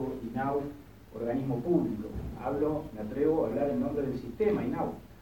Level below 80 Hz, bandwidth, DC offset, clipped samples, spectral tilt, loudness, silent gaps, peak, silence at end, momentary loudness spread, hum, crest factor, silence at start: -50 dBFS; 17.5 kHz; 0.1%; under 0.1%; -9 dB/octave; -32 LUFS; none; -16 dBFS; 0 s; 9 LU; none; 16 dB; 0 s